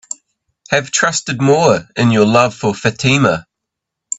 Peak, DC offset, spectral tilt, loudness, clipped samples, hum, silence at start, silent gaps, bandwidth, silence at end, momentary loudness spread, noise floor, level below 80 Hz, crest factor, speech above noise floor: 0 dBFS; under 0.1%; -4.5 dB/octave; -14 LUFS; under 0.1%; none; 0.7 s; none; 8.4 kHz; 0.05 s; 7 LU; -79 dBFS; -50 dBFS; 16 dB; 66 dB